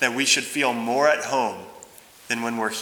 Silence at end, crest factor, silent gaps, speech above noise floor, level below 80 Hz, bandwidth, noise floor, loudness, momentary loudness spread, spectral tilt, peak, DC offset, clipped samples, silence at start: 0 s; 20 dB; none; 24 dB; -72 dBFS; over 20 kHz; -47 dBFS; -22 LUFS; 10 LU; -1.5 dB/octave; -4 dBFS; under 0.1%; under 0.1%; 0 s